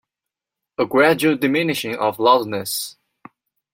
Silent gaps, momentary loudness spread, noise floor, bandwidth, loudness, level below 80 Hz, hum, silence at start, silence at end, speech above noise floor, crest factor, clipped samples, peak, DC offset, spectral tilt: none; 10 LU; -86 dBFS; 16.5 kHz; -18 LUFS; -66 dBFS; none; 0.8 s; 0.85 s; 68 dB; 18 dB; under 0.1%; -2 dBFS; under 0.1%; -4 dB/octave